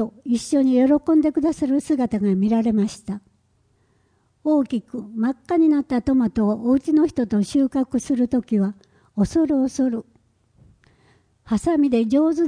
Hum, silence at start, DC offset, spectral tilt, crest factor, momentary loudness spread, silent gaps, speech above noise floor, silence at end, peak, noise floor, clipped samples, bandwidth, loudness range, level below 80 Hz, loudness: none; 0 s; under 0.1%; -7 dB/octave; 14 dB; 8 LU; none; 44 dB; 0 s; -8 dBFS; -63 dBFS; under 0.1%; 10.5 kHz; 4 LU; -50 dBFS; -20 LUFS